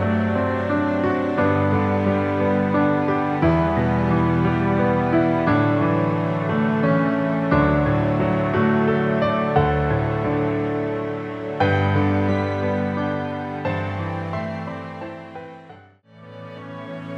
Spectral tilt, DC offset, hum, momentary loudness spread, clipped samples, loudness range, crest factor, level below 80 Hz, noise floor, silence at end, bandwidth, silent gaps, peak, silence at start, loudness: -9 dB/octave; under 0.1%; none; 11 LU; under 0.1%; 8 LU; 16 dB; -40 dBFS; -47 dBFS; 0 s; 7.4 kHz; none; -6 dBFS; 0 s; -21 LUFS